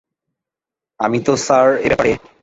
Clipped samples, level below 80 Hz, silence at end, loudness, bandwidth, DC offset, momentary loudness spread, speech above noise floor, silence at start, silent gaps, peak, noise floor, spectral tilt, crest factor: under 0.1%; -46 dBFS; 0.25 s; -15 LUFS; 8 kHz; under 0.1%; 6 LU; 72 dB; 1 s; none; -2 dBFS; -87 dBFS; -4.5 dB/octave; 16 dB